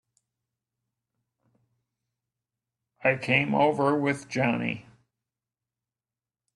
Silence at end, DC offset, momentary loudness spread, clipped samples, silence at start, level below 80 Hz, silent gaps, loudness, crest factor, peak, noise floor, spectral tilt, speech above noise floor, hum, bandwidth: 1.75 s; under 0.1%; 7 LU; under 0.1%; 3 s; -68 dBFS; none; -25 LUFS; 22 dB; -8 dBFS; under -90 dBFS; -6 dB/octave; over 65 dB; none; 11.5 kHz